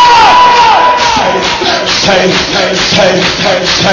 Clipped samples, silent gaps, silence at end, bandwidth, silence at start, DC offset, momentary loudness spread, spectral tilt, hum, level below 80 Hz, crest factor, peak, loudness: 1%; none; 0 s; 8 kHz; 0 s; under 0.1%; 6 LU; -3 dB/octave; none; -34 dBFS; 6 dB; 0 dBFS; -6 LUFS